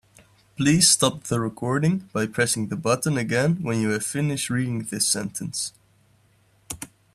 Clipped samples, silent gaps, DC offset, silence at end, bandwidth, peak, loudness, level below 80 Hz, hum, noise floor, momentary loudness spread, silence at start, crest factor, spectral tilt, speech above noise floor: under 0.1%; none; under 0.1%; 0.3 s; 14.5 kHz; -2 dBFS; -23 LUFS; -58 dBFS; none; -61 dBFS; 12 LU; 0.6 s; 22 dB; -4 dB/octave; 38 dB